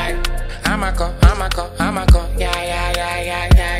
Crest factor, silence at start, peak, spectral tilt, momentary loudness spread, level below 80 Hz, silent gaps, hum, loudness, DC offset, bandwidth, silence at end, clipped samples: 16 dB; 0 s; 0 dBFS; -5 dB/octave; 7 LU; -18 dBFS; none; none; -18 LUFS; under 0.1%; 15.5 kHz; 0 s; under 0.1%